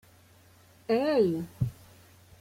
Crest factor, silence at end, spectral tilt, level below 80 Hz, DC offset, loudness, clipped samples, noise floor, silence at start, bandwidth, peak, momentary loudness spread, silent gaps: 18 dB; 0.65 s; -7.5 dB/octave; -58 dBFS; under 0.1%; -28 LUFS; under 0.1%; -58 dBFS; 0.9 s; 16.5 kHz; -14 dBFS; 10 LU; none